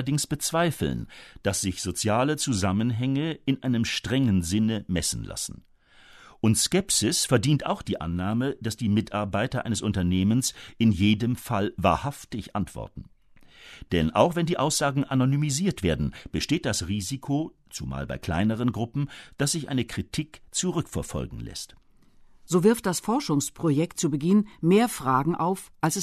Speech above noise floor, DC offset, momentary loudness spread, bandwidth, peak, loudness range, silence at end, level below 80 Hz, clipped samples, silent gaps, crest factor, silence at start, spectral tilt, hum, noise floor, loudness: 29 dB; under 0.1%; 11 LU; 13.5 kHz; -6 dBFS; 4 LU; 0 s; -48 dBFS; under 0.1%; none; 20 dB; 0 s; -5 dB/octave; none; -54 dBFS; -26 LUFS